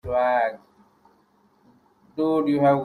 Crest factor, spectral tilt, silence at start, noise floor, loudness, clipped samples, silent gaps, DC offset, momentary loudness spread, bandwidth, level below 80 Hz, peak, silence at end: 16 dB; -8.5 dB/octave; 0.05 s; -62 dBFS; -23 LUFS; under 0.1%; none; under 0.1%; 17 LU; 10.5 kHz; -56 dBFS; -8 dBFS; 0 s